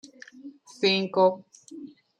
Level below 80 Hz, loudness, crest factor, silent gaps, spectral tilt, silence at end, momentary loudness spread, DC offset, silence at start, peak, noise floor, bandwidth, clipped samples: -78 dBFS; -24 LUFS; 20 dB; none; -5 dB/octave; 0.35 s; 24 LU; under 0.1%; 0.45 s; -8 dBFS; -47 dBFS; 9.8 kHz; under 0.1%